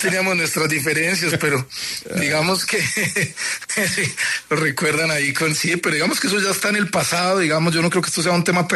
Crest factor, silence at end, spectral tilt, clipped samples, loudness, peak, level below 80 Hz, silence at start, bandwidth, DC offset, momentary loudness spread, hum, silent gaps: 14 dB; 0 s; -3.5 dB/octave; under 0.1%; -18 LUFS; -6 dBFS; -58 dBFS; 0 s; 13.5 kHz; under 0.1%; 4 LU; none; none